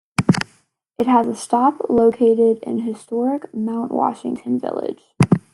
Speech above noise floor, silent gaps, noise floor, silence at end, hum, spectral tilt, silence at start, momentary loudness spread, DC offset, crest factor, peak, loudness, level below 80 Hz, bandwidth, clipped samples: 41 dB; none; -59 dBFS; 0.15 s; none; -7 dB/octave; 0.2 s; 10 LU; under 0.1%; 18 dB; -2 dBFS; -19 LUFS; -54 dBFS; 12 kHz; under 0.1%